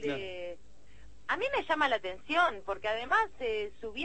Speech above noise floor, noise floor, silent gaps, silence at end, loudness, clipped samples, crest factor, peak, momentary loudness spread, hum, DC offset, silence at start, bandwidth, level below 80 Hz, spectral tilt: 26 dB; -58 dBFS; none; 0 s; -31 LUFS; under 0.1%; 20 dB; -14 dBFS; 13 LU; none; 0.5%; 0 s; 8.8 kHz; -60 dBFS; -4 dB/octave